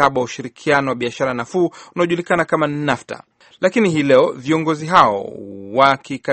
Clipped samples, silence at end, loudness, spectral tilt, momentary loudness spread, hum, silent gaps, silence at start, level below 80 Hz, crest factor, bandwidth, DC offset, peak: under 0.1%; 0 s; -17 LUFS; -5.5 dB/octave; 12 LU; none; none; 0 s; -56 dBFS; 18 dB; 8.8 kHz; under 0.1%; 0 dBFS